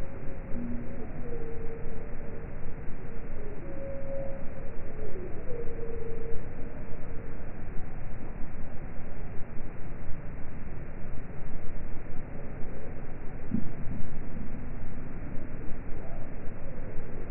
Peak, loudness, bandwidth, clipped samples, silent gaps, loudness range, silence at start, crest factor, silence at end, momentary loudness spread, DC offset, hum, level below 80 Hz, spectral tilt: -12 dBFS; -41 LUFS; 2.7 kHz; under 0.1%; none; 3 LU; 0 s; 12 dB; 0 s; 5 LU; under 0.1%; none; -34 dBFS; -6.5 dB/octave